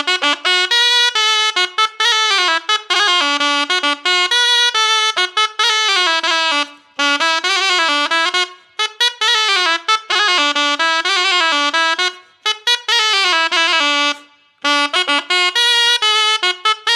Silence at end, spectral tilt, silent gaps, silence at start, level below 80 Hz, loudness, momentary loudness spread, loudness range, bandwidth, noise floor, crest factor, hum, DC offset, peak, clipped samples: 0 s; 3 dB/octave; none; 0 s; -80 dBFS; -13 LUFS; 5 LU; 2 LU; 16.5 kHz; -43 dBFS; 16 dB; none; under 0.1%; 0 dBFS; under 0.1%